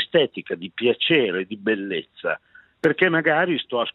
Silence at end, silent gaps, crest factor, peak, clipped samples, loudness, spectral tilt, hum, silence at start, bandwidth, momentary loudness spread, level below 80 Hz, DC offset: 0.05 s; none; 18 dB; -4 dBFS; under 0.1%; -22 LUFS; -7 dB/octave; none; 0 s; 6 kHz; 10 LU; -72 dBFS; under 0.1%